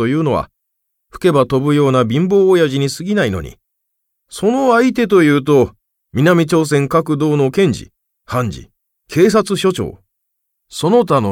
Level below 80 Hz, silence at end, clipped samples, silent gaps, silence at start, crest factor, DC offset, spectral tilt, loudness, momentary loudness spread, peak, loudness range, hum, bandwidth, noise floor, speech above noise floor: -44 dBFS; 0 s; under 0.1%; none; 0 s; 14 dB; under 0.1%; -6.5 dB/octave; -14 LUFS; 12 LU; 0 dBFS; 3 LU; none; 16.5 kHz; -73 dBFS; 59 dB